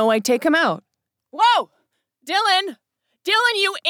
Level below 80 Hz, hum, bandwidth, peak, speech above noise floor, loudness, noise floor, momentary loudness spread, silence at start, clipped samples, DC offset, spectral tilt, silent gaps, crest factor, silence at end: -74 dBFS; none; 18.5 kHz; -6 dBFS; 51 dB; -18 LUFS; -69 dBFS; 15 LU; 0 s; under 0.1%; under 0.1%; -2.5 dB/octave; none; 14 dB; 0 s